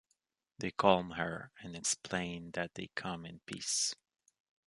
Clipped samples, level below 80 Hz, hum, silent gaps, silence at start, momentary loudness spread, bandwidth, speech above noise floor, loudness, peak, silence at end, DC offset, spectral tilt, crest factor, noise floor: under 0.1%; -66 dBFS; none; none; 0.6 s; 16 LU; 11.5 kHz; 45 dB; -36 LUFS; -10 dBFS; 0.75 s; under 0.1%; -3 dB/octave; 28 dB; -82 dBFS